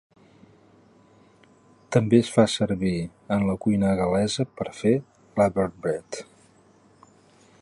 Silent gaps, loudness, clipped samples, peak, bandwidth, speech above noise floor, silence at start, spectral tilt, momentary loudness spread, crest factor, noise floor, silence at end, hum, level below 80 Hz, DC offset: none; -24 LUFS; under 0.1%; -4 dBFS; 11 kHz; 34 dB; 1.9 s; -6 dB/octave; 11 LU; 20 dB; -57 dBFS; 1.4 s; none; -52 dBFS; under 0.1%